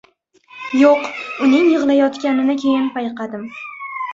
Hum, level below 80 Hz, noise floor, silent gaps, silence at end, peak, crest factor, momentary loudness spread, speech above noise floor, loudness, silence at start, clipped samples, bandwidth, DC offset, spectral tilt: none; -64 dBFS; -50 dBFS; none; 0 s; -2 dBFS; 16 dB; 16 LU; 34 dB; -16 LUFS; 0.55 s; under 0.1%; 7.6 kHz; under 0.1%; -5 dB/octave